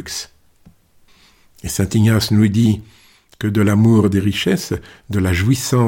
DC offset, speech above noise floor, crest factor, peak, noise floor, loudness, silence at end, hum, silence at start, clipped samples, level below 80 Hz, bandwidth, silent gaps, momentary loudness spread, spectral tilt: under 0.1%; 36 dB; 14 dB; -4 dBFS; -52 dBFS; -17 LUFS; 0 s; none; 0 s; under 0.1%; -42 dBFS; 17 kHz; none; 14 LU; -6 dB/octave